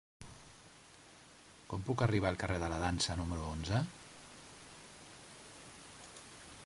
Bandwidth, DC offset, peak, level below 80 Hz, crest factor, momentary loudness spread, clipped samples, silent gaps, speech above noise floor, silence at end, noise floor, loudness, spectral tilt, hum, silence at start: 11.5 kHz; under 0.1%; -18 dBFS; -52 dBFS; 22 dB; 23 LU; under 0.1%; none; 24 dB; 0 s; -59 dBFS; -36 LUFS; -5 dB/octave; none; 0.2 s